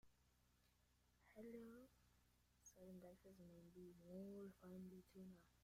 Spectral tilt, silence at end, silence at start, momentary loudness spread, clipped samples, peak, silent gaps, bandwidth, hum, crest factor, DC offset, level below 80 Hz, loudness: -6.5 dB/octave; 0 s; 0.05 s; 8 LU; under 0.1%; -48 dBFS; none; 15.5 kHz; none; 16 dB; under 0.1%; -82 dBFS; -62 LUFS